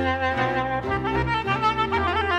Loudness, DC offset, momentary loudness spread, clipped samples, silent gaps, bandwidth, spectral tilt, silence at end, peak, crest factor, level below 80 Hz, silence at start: -23 LUFS; under 0.1%; 3 LU; under 0.1%; none; 11 kHz; -6 dB/octave; 0 s; -10 dBFS; 14 dB; -38 dBFS; 0 s